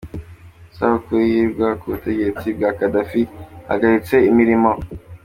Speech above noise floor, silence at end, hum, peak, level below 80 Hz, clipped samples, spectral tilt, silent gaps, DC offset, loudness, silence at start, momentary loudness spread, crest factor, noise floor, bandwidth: 25 dB; 0.05 s; none; -2 dBFS; -44 dBFS; under 0.1%; -8 dB/octave; none; under 0.1%; -18 LUFS; 0.05 s; 12 LU; 16 dB; -42 dBFS; 16 kHz